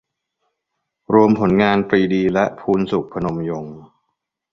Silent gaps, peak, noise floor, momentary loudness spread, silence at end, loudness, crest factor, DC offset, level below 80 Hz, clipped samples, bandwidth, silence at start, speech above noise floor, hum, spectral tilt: none; -2 dBFS; -77 dBFS; 11 LU; 0.65 s; -17 LUFS; 18 dB; under 0.1%; -50 dBFS; under 0.1%; 6.6 kHz; 1.1 s; 60 dB; none; -8 dB/octave